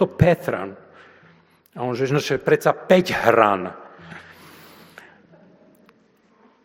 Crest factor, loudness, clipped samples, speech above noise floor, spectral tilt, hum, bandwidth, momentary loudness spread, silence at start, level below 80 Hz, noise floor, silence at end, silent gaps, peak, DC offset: 22 dB; -19 LUFS; under 0.1%; 39 dB; -6.5 dB/octave; none; 17 kHz; 24 LU; 0 s; -50 dBFS; -58 dBFS; 2.45 s; none; 0 dBFS; under 0.1%